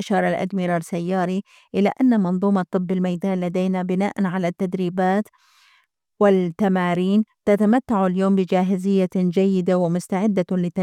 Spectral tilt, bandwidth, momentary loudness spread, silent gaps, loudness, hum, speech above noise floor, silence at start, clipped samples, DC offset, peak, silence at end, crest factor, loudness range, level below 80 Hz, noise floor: -8 dB/octave; 11 kHz; 5 LU; none; -21 LUFS; none; 42 dB; 0 s; under 0.1%; under 0.1%; -6 dBFS; 0 s; 16 dB; 3 LU; -64 dBFS; -62 dBFS